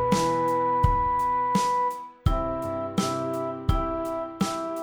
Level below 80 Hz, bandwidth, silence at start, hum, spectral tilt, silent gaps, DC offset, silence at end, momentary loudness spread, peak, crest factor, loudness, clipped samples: -36 dBFS; over 20 kHz; 0 s; none; -6 dB/octave; none; under 0.1%; 0 s; 7 LU; -6 dBFS; 18 dB; -26 LUFS; under 0.1%